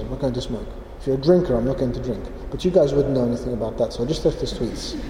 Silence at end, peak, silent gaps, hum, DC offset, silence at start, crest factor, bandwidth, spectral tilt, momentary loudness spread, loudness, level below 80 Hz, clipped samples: 0 s; -4 dBFS; none; none; under 0.1%; 0 s; 18 dB; 14.5 kHz; -7 dB/octave; 13 LU; -22 LUFS; -34 dBFS; under 0.1%